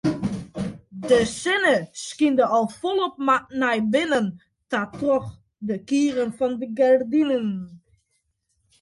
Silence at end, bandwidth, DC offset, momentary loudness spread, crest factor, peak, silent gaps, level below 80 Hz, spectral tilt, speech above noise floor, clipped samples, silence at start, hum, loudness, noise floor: 1.05 s; 11.5 kHz; under 0.1%; 13 LU; 16 dB; -6 dBFS; none; -56 dBFS; -5 dB/octave; 51 dB; under 0.1%; 0.05 s; none; -22 LUFS; -73 dBFS